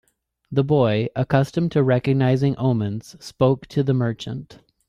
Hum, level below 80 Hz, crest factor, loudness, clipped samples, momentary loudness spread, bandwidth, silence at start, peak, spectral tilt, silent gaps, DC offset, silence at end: none; -54 dBFS; 18 dB; -21 LUFS; under 0.1%; 12 LU; 11 kHz; 0.5 s; -2 dBFS; -8 dB/octave; none; under 0.1%; 0.35 s